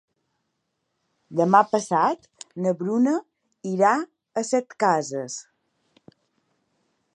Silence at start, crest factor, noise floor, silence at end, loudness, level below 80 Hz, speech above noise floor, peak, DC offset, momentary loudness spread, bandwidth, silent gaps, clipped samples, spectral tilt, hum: 1.3 s; 22 dB; -77 dBFS; 1.75 s; -23 LUFS; -80 dBFS; 55 dB; -2 dBFS; under 0.1%; 15 LU; 11 kHz; none; under 0.1%; -5.5 dB/octave; none